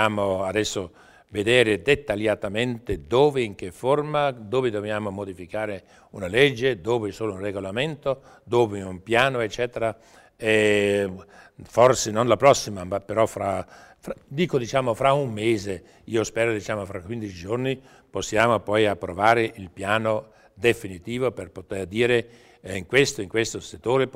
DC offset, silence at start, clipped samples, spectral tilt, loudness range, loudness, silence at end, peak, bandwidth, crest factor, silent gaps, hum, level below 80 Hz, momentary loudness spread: under 0.1%; 0 s; under 0.1%; -4.5 dB/octave; 4 LU; -24 LUFS; 0.05 s; -4 dBFS; 16 kHz; 20 dB; none; none; -52 dBFS; 14 LU